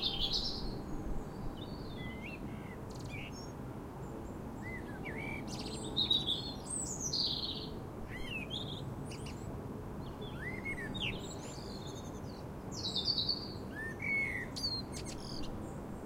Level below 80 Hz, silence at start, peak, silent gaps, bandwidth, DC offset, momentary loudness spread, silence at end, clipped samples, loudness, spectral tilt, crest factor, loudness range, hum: -50 dBFS; 0 s; -20 dBFS; none; 16 kHz; under 0.1%; 12 LU; 0 s; under 0.1%; -39 LUFS; -3.5 dB/octave; 20 dB; 9 LU; none